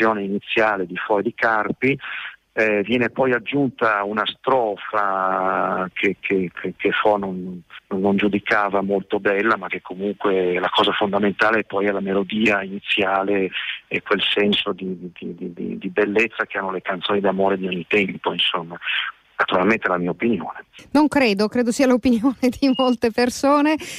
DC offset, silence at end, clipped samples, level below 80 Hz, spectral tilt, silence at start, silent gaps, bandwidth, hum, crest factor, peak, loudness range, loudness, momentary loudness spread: under 0.1%; 0 s; under 0.1%; -56 dBFS; -5 dB/octave; 0 s; none; 15 kHz; none; 14 dB; -6 dBFS; 3 LU; -20 LUFS; 9 LU